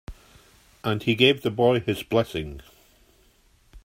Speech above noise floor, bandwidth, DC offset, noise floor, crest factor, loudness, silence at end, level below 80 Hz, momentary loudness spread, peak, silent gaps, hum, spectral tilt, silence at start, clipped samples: 37 dB; 16 kHz; under 0.1%; -60 dBFS; 22 dB; -23 LUFS; 0.05 s; -50 dBFS; 14 LU; -4 dBFS; none; none; -6 dB/octave; 0.1 s; under 0.1%